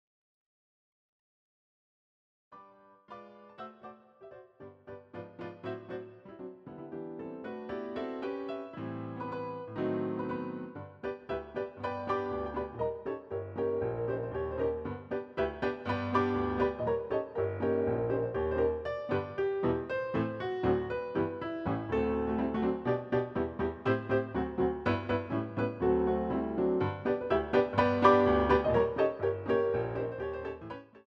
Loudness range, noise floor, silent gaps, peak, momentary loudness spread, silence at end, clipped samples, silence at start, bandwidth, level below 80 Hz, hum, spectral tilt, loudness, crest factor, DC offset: 18 LU; -58 dBFS; none; -10 dBFS; 17 LU; 0.05 s; under 0.1%; 2.5 s; 6.4 kHz; -52 dBFS; none; -8.5 dB/octave; -32 LUFS; 24 dB; under 0.1%